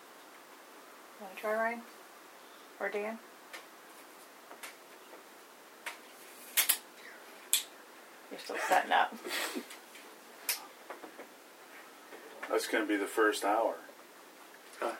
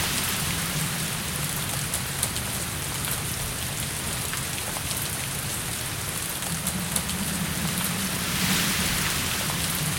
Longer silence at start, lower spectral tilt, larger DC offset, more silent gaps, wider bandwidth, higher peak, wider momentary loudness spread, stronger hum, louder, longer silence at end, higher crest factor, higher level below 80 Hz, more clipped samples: about the same, 0 s vs 0 s; second, -0.5 dB/octave vs -2.5 dB/octave; neither; neither; first, over 20 kHz vs 17.5 kHz; second, -10 dBFS vs -4 dBFS; first, 23 LU vs 5 LU; neither; second, -33 LUFS vs -26 LUFS; about the same, 0 s vs 0 s; about the same, 28 dB vs 24 dB; second, under -90 dBFS vs -44 dBFS; neither